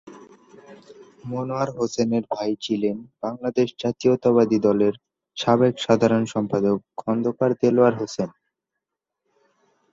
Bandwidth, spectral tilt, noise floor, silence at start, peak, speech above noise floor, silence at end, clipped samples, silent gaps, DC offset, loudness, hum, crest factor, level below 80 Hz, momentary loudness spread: 7.8 kHz; -6.5 dB/octave; -83 dBFS; 0.05 s; -4 dBFS; 62 dB; 1.65 s; under 0.1%; none; under 0.1%; -22 LUFS; none; 20 dB; -62 dBFS; 12 LU